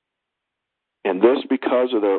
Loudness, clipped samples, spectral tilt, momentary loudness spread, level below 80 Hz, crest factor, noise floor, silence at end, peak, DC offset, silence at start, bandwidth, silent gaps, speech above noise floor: -20 LUFS; under 0.1%; -10 dB/octave; 8 LU; -72 dBFS; 20 dB; -82 dBFS; 0 s; -2 dBFS; under 0.1%; 1.05 s; 4.4 kHz; none; 63 dB